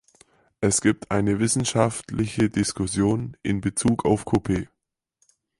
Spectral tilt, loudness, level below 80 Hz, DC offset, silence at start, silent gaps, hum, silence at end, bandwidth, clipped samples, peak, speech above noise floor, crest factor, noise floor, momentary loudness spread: -5 dB/octave; -23 LUFS; -46 dBFS; under 0.1%; 0.6 s; none; none; 0.95 s; 11.5 kHz; under 0.1%; -4 dBFS; 47 dB; 20 dB; -70 dBFS; 7 LU